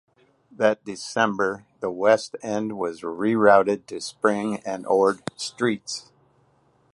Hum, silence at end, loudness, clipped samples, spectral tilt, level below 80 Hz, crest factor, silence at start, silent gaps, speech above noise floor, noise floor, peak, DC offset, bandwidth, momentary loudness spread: none; 0.95 s; -23 LUFS; under 0.1%; -4.5 dB/octave; -66 dBFS; 20 dB; 0.6 s; none; 40 dB; -62 dBFS; -4 dBFS; under 0.1%; 11.5 kHz; 12 LU